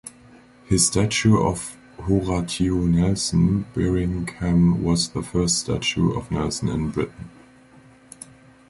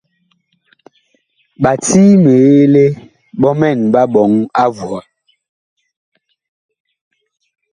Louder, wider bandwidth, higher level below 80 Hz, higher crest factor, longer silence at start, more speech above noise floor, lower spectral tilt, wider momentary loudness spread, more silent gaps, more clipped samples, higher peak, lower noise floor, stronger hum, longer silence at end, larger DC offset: second, -22 LUFS vs -11 LUFS; about the same, 11.5 kHz vs 11 kHz; first, -38 dBFS vs -52 dBFS; about the same, 16 dB vs 14 dB; second, 0.05 s vs 1.6 s; second, 29 dB vs 52 dB; second, -5 dB/octave vs -7 dB/octave; about the same, 15 LU vs 17 LU; neither; neither; second, -6 dBFS vs 0 dBFS; second, -50 dBFS vs -62 dBFS; neither; second, 1.4 s vs 2.75 s; neither